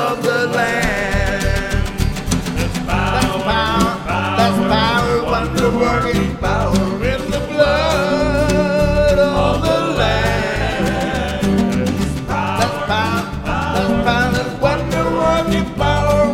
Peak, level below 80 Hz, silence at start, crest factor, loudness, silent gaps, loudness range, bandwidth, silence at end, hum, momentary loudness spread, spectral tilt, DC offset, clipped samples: 0 dBFS; -26 dBFS; 0 s; 16 dB; -17 LUFS; none; 2 LU; 16.5 kHz; 0 s; none; 5 LU; -5.5 dB/octave; under 0.1%; under 0.1%